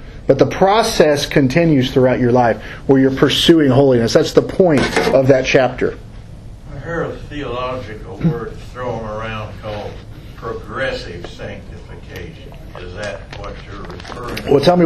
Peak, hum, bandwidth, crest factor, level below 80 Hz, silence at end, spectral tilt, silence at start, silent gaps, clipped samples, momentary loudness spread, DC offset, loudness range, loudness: 0 dBFS; none; 13.5 kHz; 16 dB; -36 dBFS; 0 s; -6 dB/octave; 0 s; none; under 0.1%; 20 LU; under 0.1%; 15 LU; -15 LUFS